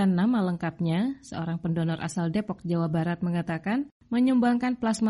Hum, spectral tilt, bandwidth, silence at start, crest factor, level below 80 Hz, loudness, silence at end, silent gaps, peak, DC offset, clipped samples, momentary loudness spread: none; -7 dB/octave; 11.5 kHz; 0 s; 14 dB; -60 dBFS; -27 LUFS; 0 s; 3.92-4.00 s; -12 dBFS; under 0.1%; under 0.1%; 8 LU